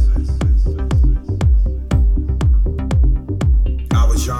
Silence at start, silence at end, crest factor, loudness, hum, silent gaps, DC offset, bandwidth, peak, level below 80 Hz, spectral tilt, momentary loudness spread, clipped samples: 0 s; 0 s; 8 dB; -17 LUFS; none; none; under 0.1%; 12 kHz; -6 dBFS; -14 dBFS; -7 dB/octave; 2 LU; under 0.1%